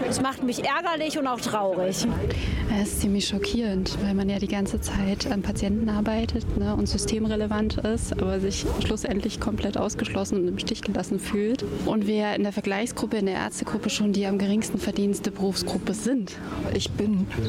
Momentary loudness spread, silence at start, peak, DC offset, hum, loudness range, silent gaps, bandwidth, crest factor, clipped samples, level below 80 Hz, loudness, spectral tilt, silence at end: 3 LU; 0 s; -12 dBFS; under 0.1%; none; 1 LU; none; 16 kHz; 14 dB; under 0.1%; -38 dBFS; -26 LUFS; -5 dB/octave; 0 s